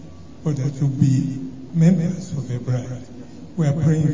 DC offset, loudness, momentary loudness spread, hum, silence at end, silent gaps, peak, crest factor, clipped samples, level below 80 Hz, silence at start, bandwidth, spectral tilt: 0.8%; -21 LUFS; 16 LU; none; 0 s; none; -2 dBFS; 18 dB; under 0.1%; -48 dBFS; 0 s; 7.6 kHz; -8.5 dB/octave